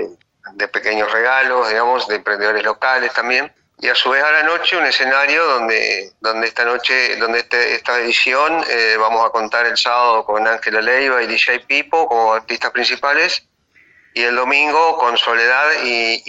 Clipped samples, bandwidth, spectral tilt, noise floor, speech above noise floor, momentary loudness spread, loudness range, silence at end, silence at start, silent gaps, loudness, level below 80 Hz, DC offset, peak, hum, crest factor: under 0.1%; 8.2 kHz; -1 dB/octave; -52 dBFS; 37 dB; 5 LU; 2 LU; 0 s; 0 s; none; -15 LUFS; -60 dBFS; under 0.1%; -2 dBFS; none; 14 dB